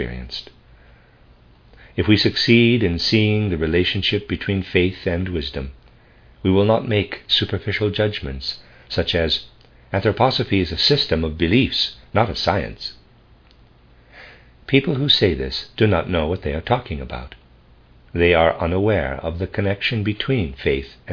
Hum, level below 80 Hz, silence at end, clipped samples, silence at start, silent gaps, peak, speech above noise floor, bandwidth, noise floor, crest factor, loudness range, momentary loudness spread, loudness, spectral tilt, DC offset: none; -38 dBFS; 0 s; under 0.1%; 0 s; none; 0 dBFS; 31 dB; 5.4 kHz; -51 dBFS; 20 dB; 4 LU; 12 LU; -19 LUFS; -6.5 dB/octave; under 0.1%